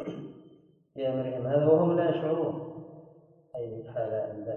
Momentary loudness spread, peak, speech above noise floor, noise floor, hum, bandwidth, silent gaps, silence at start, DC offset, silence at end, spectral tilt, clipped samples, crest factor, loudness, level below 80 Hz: 22 LU; -12 dBFS; 32 dB; -58 dBFS; none; 4 kHz; none; 0 s; under 0.1%; 0 s; -10.5 dB/octave; under 0.1%; 18 dB; -29 LUFS; -68 dBFS